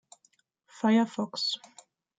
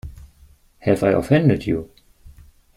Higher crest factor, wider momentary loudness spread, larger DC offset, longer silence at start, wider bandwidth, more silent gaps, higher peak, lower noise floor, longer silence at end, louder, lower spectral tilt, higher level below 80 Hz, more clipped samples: about the same, 18 dB vs 18 dB; second, 6 LU vs 10 LU; neither; first, 0.75 s vs 0.05 s; second, 9.2 kHz vs 14.5 kHz; neither; second, -12 dBFS vs -2 dBFS; first, -70 dBFS vs -52 dBFS; first, 0.65 s vs 0.5 s; second, -28 LUFS vs -19 LUFS; second, -4.5 dB/octave vs -8 dB/octave; second, -80 dBFS vs -44 dBFS; neither